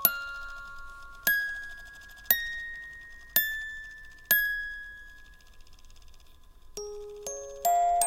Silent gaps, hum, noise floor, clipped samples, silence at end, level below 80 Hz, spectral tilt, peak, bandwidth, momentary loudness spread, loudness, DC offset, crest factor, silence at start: none; none; -52 dBFS; under 0.1%; 0 s; -52 dBFS; 0 dB/octave; -6 dBFS; 16.5 kHz; 21 LU; -29 LUFS; under 0.1%; 28 dB; 0 s